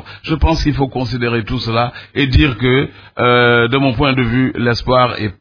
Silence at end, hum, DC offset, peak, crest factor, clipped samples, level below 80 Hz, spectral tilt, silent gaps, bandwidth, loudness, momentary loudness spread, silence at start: 0.1 s; none; under 0.1%; 0 dBFS; 14 dB; under 0.1%; -26 dBFS; -7 dB/octave; none; 5.4 kHz; -14 LUFS; 7 LU; 0.05 s